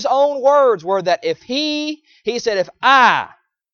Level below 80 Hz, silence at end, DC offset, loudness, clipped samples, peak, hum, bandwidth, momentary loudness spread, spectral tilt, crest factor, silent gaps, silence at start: -64 dBFS; 0.45 s; under 0.1%; -16 LUFS; under 0.1%; 0 dBFS; none; 7 kHz; 13 LU; -3 dB/octave; 16 dB; none; 0 s